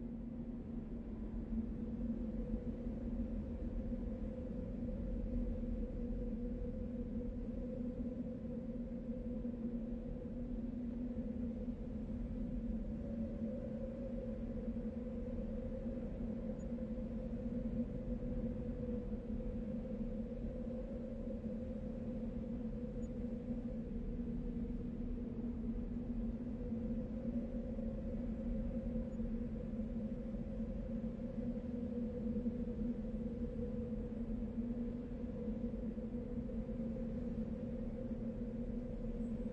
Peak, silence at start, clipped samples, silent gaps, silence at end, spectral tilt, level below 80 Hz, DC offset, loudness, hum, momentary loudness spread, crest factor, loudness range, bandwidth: -26 dBFS; 0 s; under 0.1%; none; 0 s; -10.5 dB/octave; -48 dBFS; under 0.1%; -44 LUFS; none; 3 LU; 16 dB; 2 LU; 4.9 kHz